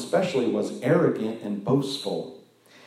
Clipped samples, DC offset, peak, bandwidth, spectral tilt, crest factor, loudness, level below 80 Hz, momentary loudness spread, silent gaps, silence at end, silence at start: under 0.1%; under 0.1%; -8 dBFS; 14 kHz; -6.5 dB/octave; 16 dB; -25 LUFS; -74 dBFS; 9 LU; none; 0.45 s; 0 s